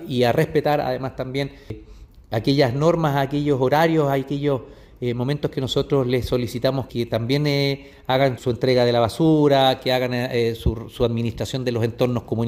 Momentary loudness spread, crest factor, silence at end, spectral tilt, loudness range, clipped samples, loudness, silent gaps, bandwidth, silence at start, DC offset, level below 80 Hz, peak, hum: 9 LU; 18 dB; 0 s; -6.5 dB/octave; 3 LU; under 0.1%; -21 LUFS; none; 16 kHz; 0 s; under 0.1%; -42 dBFS; -4 dBFS; none